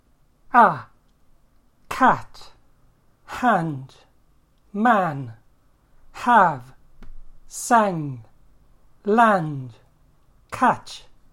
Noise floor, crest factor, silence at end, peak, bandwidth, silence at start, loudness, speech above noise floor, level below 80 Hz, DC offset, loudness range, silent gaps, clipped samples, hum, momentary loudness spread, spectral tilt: -58 dBFS; 22 dB; 0.35 s; -2 dBFS; 16.5 kHz; 0.55 s; -20 LUFS; 38 dB; -50 dBFS; under 0.1%; 3 LU; none; under 0.1%; none; 21 LU; -5.5 dB/octave